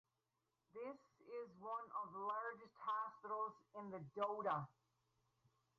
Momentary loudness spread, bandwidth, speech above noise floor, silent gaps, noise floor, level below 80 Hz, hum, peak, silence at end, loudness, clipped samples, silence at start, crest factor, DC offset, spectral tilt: 11 LU; 7.2 kHz; 42 dB; none; -89 dBFS; -90 dBFS; none; -32 dBFS; 1.1 s; -48 LUFS; under 0.1%; 0.75 s; 18 dB; under 0.1%; -4.5 dB/octave